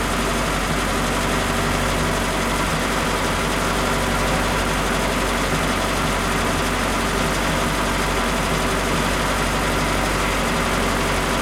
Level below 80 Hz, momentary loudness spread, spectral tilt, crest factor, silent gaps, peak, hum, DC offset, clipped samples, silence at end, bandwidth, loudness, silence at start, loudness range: -30 dBFS; 1 LU; -4 dB/octave; 14 dB; none; -6 dBFS; none; under 0.1%; under 0.1%; 0 s; 16.5 kHz; -20 LUFS; 0 s; 0 LU